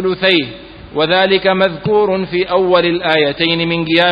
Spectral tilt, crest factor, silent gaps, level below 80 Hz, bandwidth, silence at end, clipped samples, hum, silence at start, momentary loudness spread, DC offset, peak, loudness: -7.5 dB/octave; 14 dB; none; -46 dBFS; 5.2 kHz; 0 s; under 0.1%; none; 0 s; 5 LU; under 0.1%; 0 dBFS; -13 LUFS